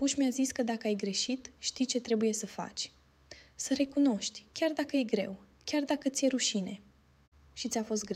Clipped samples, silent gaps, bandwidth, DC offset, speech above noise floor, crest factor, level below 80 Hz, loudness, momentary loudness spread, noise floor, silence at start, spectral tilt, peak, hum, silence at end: under 0.1%; 7.28-7.32 s; 15 kHz; under 0.1%; 24 dB; 18 dB; -68 dBFS; -32 LUFS; 11 LU; -56 dBFS; 0 s; -3.5 dB/octave; -16 dBFS; none; 0 s